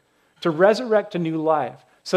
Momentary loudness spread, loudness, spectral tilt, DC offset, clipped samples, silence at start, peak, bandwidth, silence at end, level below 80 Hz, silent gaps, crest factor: 11 LU; -21 LUFS; -6 dB/octave; under 0.1%; under 0.1%; 0.4 s; -2 dBFS; 12 kHz; 0 s; -76 dBFS; none; 18 dB